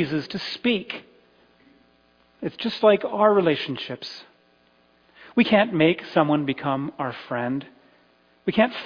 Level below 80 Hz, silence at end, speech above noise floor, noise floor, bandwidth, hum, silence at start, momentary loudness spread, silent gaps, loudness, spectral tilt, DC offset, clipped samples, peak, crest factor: -64 dBFS; 0 s; 38 dB; -60 dBFS; 5.2 kHz; none; 0 s; 15 LU; none; -23 LUFS; -7 dB/octave; under 0.1%; under 0.1%; -4 dBFS; 20 dB